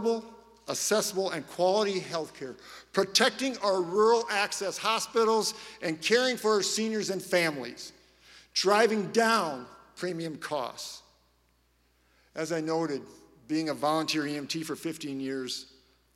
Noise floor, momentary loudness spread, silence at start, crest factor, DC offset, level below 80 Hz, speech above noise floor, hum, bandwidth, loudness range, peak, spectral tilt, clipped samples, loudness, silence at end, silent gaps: -68 dBFS; 15 LU; 0 s; 22 dB; under 0.1%; -72 dBFS; 40 dB; none; 16 kHz; 9 LU; -8 dBFS; -3 dB/octave; under 0.1%; -28 LUFS; 0.5 s; none